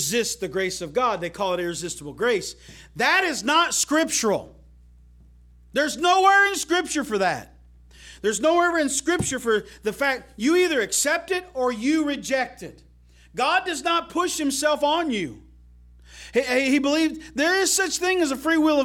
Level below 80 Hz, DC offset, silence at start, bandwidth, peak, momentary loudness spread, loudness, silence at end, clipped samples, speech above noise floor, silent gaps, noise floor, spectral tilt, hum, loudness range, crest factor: -52 dBFS; under 0.1%; 0 s; 17.5 kHz; -6 dBFS; 9 LU; -22 LUFS; 0 s; under 0.1%; 28 dB; none; -51 dBFS; -2.5 dB/octave; 60 Hz at -55 dBFS; 3 LU; 18 dB